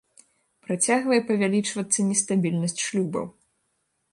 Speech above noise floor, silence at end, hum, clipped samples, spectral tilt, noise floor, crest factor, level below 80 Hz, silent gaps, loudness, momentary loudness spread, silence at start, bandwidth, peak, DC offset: 50 dB; 0.8 s; none; under 0.1%; -4 dB/octave; -74 dBFS; 18 dB; -70 dBFS; none; -24 LUFS; 8 LU; 0.7 s; 11.5 kHz; -8 dBFS; under 0.1%